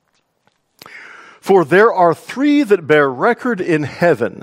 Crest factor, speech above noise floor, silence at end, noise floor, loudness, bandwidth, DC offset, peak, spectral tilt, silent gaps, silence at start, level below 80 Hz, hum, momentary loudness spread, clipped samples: 16 dB; 49 dB; 0.05 s; -63 dBFS; -14 LUFS; 15.5 kHz; under 0.1%; 0 dBFS; -6.5 dB/octave; none; 0.95 s; -62 dBFS; none; 8 LU; under 0.1%